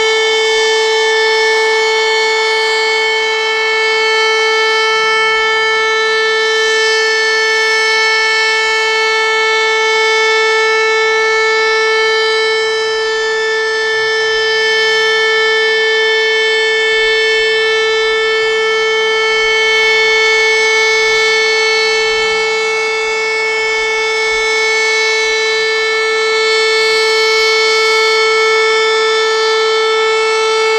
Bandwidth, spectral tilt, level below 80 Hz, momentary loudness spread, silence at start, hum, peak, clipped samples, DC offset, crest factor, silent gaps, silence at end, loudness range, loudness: 11.5 kHz; 1 dB/octave; -50 dBFS; 3 LU; 0 s; none; -2 dBFS; under 0.1%; under 0.1%; 10 dB; none; 0 s; 2 LU; -11 LUFS